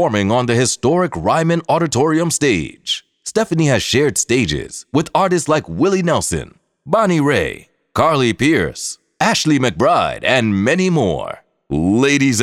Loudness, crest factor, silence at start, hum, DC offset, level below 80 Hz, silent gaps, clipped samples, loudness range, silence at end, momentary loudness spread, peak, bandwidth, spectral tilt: -16 LUFS; 16 dB; 0 s; none; under 0.1%; -42 dBFS; none; under 0.1%; 2 LU; 0 s; 8 LU; 0 dBFS; 15.5 kHz; -4.5 dB/octave